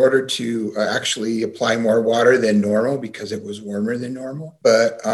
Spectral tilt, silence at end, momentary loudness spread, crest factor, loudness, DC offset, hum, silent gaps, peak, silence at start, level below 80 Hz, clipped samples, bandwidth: -4.5 dB/octave; 0 s; 13 LU; 16 dB; -19 LUFS; under 0.1%; none; none; -2 dBFS; 0 s; -66 dBFS; under 0.1%; 12.5 kHz